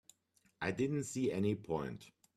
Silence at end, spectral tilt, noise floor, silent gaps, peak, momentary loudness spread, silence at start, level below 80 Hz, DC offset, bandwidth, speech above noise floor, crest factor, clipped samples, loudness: 0.3 s; -6 dB/octave; -75 dBFS; none; -22 dBFS; 8 LU; 0.6 s; -68 dBFS; under 0.1%; 14 kHz; 38 dB; 18 dB; under 0.1%; -38 LUFS